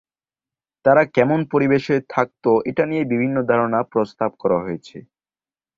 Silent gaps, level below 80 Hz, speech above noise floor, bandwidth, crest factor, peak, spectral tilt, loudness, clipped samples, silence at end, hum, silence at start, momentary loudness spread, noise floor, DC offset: none; -58 dBFS; over 71 dB; 7.6 kHz; 18 dB; -2 dBFS; -8 dB/octave; -19 LUFS; under 0.1%; 0.8 s; none; 0.85 s; 7 LU; under -90 dBFS; under 0.1%